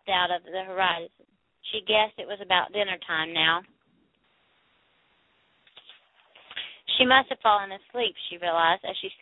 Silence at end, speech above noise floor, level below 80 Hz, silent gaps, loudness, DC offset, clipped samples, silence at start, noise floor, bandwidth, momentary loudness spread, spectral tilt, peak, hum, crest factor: 0.05 s; 42 dB; -66 dBFS; none; -25 LUFS; under 0.1%; under 0.1%; 0.05 s; -68 dBFS; 4.1 kHz; 15 LU; -7 dB/octave; -4 dBFS; none; 24 dB